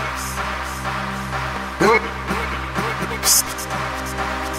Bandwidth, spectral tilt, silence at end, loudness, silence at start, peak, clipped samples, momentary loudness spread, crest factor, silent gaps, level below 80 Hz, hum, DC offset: 16 kHz; -2.5 dB/octave; 0 s; -21 LUFS; 0 s; -2 dBFS; under 0.1%; 10 LU; 18 dB; none; -34 dBFS; none; under 0.1%